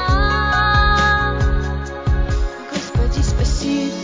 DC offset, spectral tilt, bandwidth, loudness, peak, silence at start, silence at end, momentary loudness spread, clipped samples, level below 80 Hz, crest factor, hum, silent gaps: under 0.1%; -5 dB/octave; 7.6 kHz; -18 LUFS; -2 dBFS; 0 s; 0 s; 9 LU; under 0.1%; -20 dBFS; 14 dB; none; none